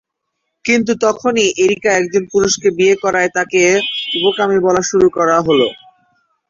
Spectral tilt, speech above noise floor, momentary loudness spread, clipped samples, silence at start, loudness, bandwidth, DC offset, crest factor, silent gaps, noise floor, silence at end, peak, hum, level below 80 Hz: -3.5 dB/octave; 60 dB; 3 LU; under 0.1%; 0.65 s; -14 LUFS; 7.6 kHz; under 0.1%; 14 dB; none; -73 dBFS; 0.75 s; 0 dBFS; none; -52 dBFS